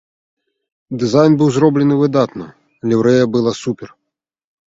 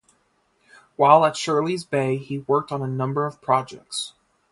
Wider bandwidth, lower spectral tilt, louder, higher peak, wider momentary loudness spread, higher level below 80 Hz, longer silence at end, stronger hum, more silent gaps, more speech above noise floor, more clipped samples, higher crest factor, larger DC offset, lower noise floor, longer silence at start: second, 7.8 kHz vs 11.5 kHz; first, -7 dB/octave vs -5.5 dB/octave; first, -14 LUFS vs -22 LUFS; about the same, 0 dBFS vs 0 dBFS; about the same, 13 LU vs 14 LU; first, -56 dBFS vs -66 dBFS; first, 0.8 s vs 0.4 s; neither; neither; first, 65 dB vs 45 dB; neither; second, 16 dB vs 22 dB; neither; first, -78 dBFS vs -66 dBFS; about the same, 0.9 s vs 1 s